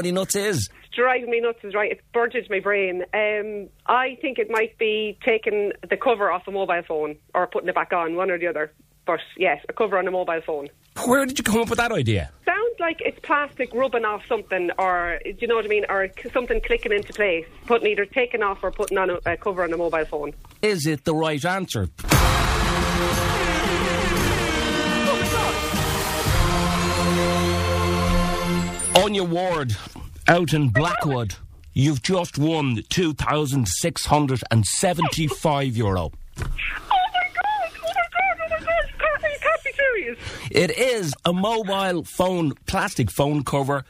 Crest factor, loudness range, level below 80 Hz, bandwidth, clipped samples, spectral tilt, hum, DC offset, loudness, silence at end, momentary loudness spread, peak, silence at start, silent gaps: 20 dB; 3 LU; -36 dBFS; 15.5 kHz; under 0.1%; -4.5 dB/octave; none; under 0.1%; -22 LUFS; 0.05 s; 7 LU; -2 dBFS; 0 s; none